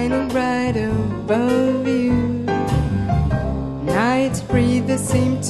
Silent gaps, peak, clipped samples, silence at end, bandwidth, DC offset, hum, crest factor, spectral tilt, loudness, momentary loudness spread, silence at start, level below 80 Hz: none; -4 dBFS; under 0.1%; 0 s; 12.5 kHz; under 0.1%; none; 14 dB; -6.5 dB/octave; -19 LUFS; 4 LU; 0 s; -32 dBFS